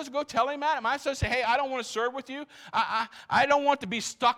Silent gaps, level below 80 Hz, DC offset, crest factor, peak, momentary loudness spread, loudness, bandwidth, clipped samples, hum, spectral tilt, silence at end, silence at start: none; -52 dBFS; under 0.1%; 18 dB; -8 dBFS; 8 LU; -27 LUFS; 15.5 kHz; under 0.1%; none; -3.5 dB/octave; 0 s; 0 s